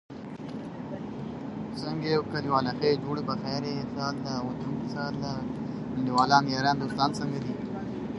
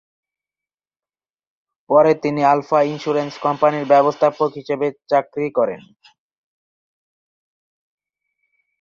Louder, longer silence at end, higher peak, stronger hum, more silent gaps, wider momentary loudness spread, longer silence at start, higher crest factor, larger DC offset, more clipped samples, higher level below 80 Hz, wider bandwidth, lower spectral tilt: second, -30 LUFS vs -18 LUFS; second, 0 s vs 3 s; about the same, -4 dBFS vs -2 dBFS; neither; neither; first, 12 LU vs 8 LU; second, 0.1 s vs 1.9 s; first, 24 dB vs 18 dB; neither; neither; first, -56 dBFS vs -68 dBFS; first, 11.5 kHz vs 7.2 kHz; about the same, -6 dB/octave vs -7 dB/octave